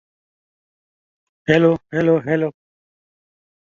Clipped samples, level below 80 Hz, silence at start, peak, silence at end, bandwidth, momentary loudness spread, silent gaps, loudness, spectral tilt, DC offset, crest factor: under 0.1%; -56 dBFS; 1.5 s; -2 dBFS; 1.25 s; 7.2 kHz; 10 LU; none; -18 LUFS; -8 dB/octave; under 0.1%; 20 dB